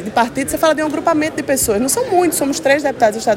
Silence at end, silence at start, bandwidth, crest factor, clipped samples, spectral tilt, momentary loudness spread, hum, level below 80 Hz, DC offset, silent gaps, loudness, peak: 0 s; 0 s; 17 kHz; 14 dB; under 0.1%; -3 dB/octave; 3 LU; none; -46 dBFS; under 0.1%; none; -16 LUFS; 0 dBFS